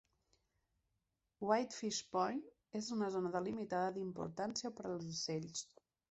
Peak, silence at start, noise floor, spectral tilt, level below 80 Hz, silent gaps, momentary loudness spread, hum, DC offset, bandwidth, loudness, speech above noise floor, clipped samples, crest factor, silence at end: -20 dBFS; 1.4 s; -87 dBFS; -4 dB/octave; -78 dBFS; none; 9 LU; none; under 0.1%; 8.2 kHz; -41 LUFS; 46 dB; under 0.1%; 22 dB; 0.45 s